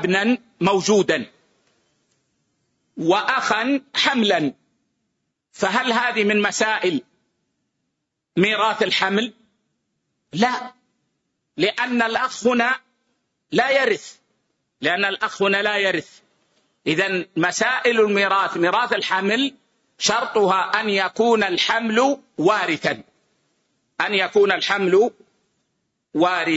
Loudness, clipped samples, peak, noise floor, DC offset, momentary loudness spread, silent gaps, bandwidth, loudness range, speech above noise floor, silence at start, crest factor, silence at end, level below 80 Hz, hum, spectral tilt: -20 LUFS; under 0.1%; -4 dBFS; -78 dBFS; under 0.1%; 8 LU; none; 8 kHz; 3 LU; 58 dB; 0 s; 16 dB; 0 s; -66 dBFS; none; -3.5 dB/octave